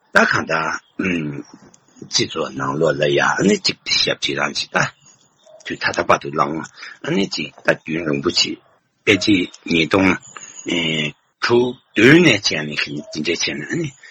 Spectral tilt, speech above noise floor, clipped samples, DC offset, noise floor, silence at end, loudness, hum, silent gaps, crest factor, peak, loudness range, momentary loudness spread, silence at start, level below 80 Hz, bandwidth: -4 dB/octave; 33 dB; under 0.1%; under 0.1%; -51 dBFS; 0 s; -18 LUFS; none; none; 18 dB; 0 dBFS; 5 LU; 10 LU; 0.15 s; -54 dBFS; 11 kHz